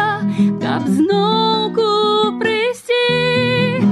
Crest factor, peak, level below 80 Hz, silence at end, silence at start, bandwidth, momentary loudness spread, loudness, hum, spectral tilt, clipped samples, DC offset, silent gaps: 10 dB; -4 dBFS; -54 dBFS; 0 s; 0 s; 12.5 kHz; 3 LU; -16 LUFS; none; -6 dB/octave; under 0.1%; under 0.1%; none